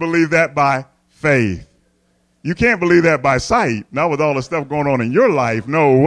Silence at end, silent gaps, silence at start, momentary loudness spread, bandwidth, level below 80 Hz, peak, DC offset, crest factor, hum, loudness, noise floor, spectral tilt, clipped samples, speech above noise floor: 0 s; none; 0 s; 9 LU; 10.5 kHz; -44 dBFS; -2 dBFS; under 0.1%; 14 dB; none; -16 LUFS; -61 dBFS; -6.5 dB/octave; under 0.1%; 45 dB